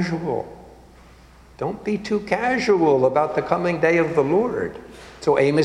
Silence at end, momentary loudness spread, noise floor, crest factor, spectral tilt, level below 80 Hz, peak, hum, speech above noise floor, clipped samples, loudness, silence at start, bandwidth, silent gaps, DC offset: 0 s; 12 LU; -48 dBFS; 18 dB; -6.5 dB/octave; -52 dBFS; -2 dBFS; none; 27 dB; under 0.1%; -21 LUFS; 0 s; 11 kHz; none; under 0.1%